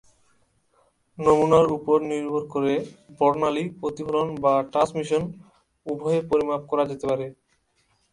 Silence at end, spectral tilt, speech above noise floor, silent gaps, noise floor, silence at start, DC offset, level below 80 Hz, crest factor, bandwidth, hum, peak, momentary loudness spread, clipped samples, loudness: 0.8 s; -6.5 dB/octave; 45 dB; none; -68 dBFS; 1.2 s; under 0.1%; -58 dBFS; 20 dB; 11 kHz; none; -4 dBFS; 11 LU; under 0.1%; -23 LUFS